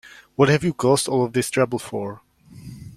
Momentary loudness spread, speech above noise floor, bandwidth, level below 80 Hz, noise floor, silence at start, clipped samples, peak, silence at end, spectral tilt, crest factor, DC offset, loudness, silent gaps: 17 LU; 21 dB; 15.5 kHz; -54 dBFS; -41 dBFS; 0.05 s; under 0.1%; -2 dBFS; 0.05 s; -5 dB/octave; 20 dB; under 0.1%; -21 LUFS; none